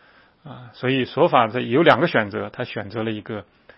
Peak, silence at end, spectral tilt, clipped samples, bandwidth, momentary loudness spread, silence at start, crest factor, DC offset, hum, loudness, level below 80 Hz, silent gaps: 0 dBFS; 0.35 s; -8 dB/octave; under 0.1%; 6.4 kHz; 18 LU; 0.45 s; 22 dB; under 0.1%; none; -20 LUFS; -64 dBFS; none